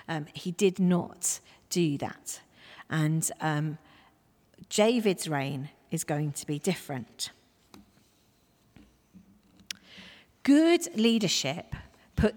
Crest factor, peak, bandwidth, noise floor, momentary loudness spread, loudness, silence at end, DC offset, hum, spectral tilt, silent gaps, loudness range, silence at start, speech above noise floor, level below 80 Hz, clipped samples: 20 dB; -10 dBFS; 19.5 kHz; -66 dBFS; 18 LU; -29 LUFS; 0 s; under 0.1%; none; -4.5 dB/octave; none; 11 LU; 0.1 s; 38 dB; -52 dBFS; under 0.1%